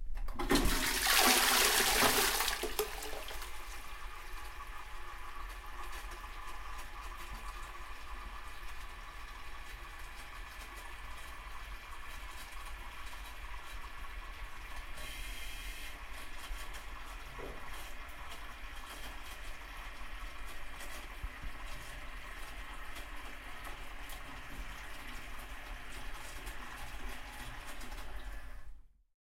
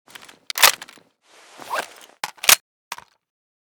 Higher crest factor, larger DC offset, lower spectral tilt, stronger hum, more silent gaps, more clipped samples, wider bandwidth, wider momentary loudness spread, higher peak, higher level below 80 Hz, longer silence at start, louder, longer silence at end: about the same, 28 dB vs 24 dB; neither; first, -1.5 dB/octave vs 2 dB/octave; neither; second, none vs 2.60-2.91 s; neither; second, 16 kHz vs over 20 kHz; second, 18 LU vs 22 LU; second, -10 dBFS vs 0 dBFS; first, -46 dBFS vs -64 dBFS; second, 0 s vs 0.55 s; second, -38 LUFS vs -17 LUFS; second, 0.35 s vs 0.8 s